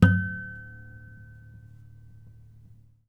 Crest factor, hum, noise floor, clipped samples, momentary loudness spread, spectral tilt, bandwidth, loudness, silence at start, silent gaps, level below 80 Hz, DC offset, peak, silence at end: 28 dB; none; -53 dBFS; under 0.1%; 24 LU; -8.5 dB/octave; 6 kHz; -28 LUFS; 0 s; none; -48 dBFS; under 0.1%; -2 dBFS; 2.1 s